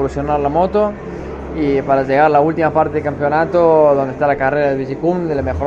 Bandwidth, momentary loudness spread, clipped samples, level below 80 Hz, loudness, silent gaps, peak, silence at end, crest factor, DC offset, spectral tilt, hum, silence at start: 7.8 kHz; 8 LU; under 0.1%; -36 dBFS; -15 LUFS; none; 0 dBFS; 0 s; 14 dB; under 0.1%; -8.5 dB/octave; none; 0 s